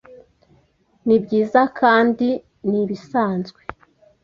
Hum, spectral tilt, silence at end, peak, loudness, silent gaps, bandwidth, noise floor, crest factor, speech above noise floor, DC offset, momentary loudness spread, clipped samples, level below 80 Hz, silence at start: none; -7.5 dB/octave; 0.75 s; -2 dBFS; -19 LUFS; none; 7 kHz; -60 dBFS; 18 dB; 42 dB; under 0.1%; 13 LU; under 0.1%; -58 dBFS; 1.05 s